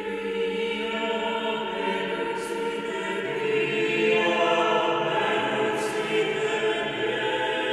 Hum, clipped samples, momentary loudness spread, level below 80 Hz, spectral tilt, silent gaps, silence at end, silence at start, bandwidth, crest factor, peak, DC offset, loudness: none; under 0.1%; 7 LU; -62 dBFS; -4 dB/octave; none; 0 s; 0 s; 12.5 kHz; 16 dB; -10 dBFS; under 0.1%; -25 LUFS